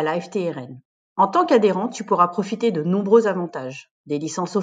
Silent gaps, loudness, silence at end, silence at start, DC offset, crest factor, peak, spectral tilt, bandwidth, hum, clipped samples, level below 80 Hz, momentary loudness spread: 0.85-1.16 s, 3.91-4.04 s; -20 LUFS; 0 s; 0 s; under 0.1%; 18 dB; -2 dBFS; -6 dB/octave; 9.2 kHz; none; under 0.1%; -74 dBFS; 16 LU